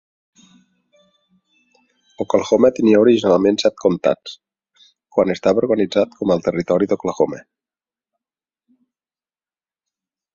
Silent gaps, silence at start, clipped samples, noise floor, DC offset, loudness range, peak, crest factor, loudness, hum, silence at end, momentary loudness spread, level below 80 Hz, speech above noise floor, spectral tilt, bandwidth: none; 2.2 s; under 0.1%; under -90 dBFS; under 0.1%; 8 LU; -2 dBFS; 18 dB; -17 LUFS; none; 2.95 s; 8 LU; -56 dBFS; over 74 dB; -6 dB/octave; 7.6 kHz